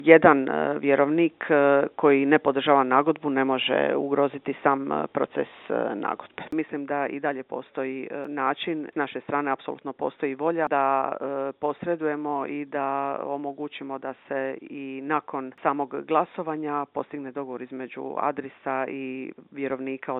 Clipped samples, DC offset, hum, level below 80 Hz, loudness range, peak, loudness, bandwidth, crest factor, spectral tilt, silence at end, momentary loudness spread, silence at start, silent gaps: under 0.1%; under 0.1%; none; -74 dBFS; 9 LU; 0 dBFS; -26 LUFS; 4.1 kHz; 26 dB; -3.5 dB/octave; 0 s; 13 LU; 0 s; none